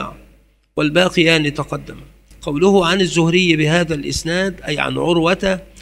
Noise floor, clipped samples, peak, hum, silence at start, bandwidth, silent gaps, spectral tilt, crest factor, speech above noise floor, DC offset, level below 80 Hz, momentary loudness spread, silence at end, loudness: -51 dBFS; under 0.1%; 0 dBFS; none; 0 s; 13.5 kHz; none; -5 dB/octave; 18 dB; 35 dB; under 0.1%; -40 dBFS; 13 LU; 0 s; -16 LUFS